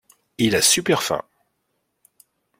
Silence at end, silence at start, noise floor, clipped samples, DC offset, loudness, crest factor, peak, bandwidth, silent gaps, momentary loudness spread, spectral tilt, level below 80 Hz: 1.4 s; 0.4 s; -73 dBFS; under 0.1%; under 0.1%; -19 LUFS; 20 dB; -4 dBFS; 16.5 kHz; none; 10 LU; -2.5 dB/octave; -58 dBFS